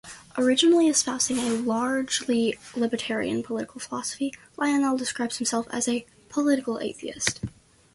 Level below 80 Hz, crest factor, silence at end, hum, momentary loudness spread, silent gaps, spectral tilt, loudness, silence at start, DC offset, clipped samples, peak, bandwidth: -60 dBFS; 20 dB; 0.45 s; none; 12 LU; none; -2.5 dB/octave; -25 LUFS; 0.05 s; under 0.1%; under 0.1%; -6 dBFS; 12 kHz